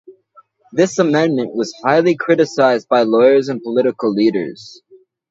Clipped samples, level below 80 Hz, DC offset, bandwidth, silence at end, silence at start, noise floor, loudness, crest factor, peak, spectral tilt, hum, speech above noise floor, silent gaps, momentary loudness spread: under 0.1%; -66 dBFS; under 0.1%; 8 kHz; 0.55 s; 0.1 s; -51 dBFS; -15 LUFS; 16 dB; 0 dBFS; -5.5 dB/octave; none; 36 dB; none; 10 LU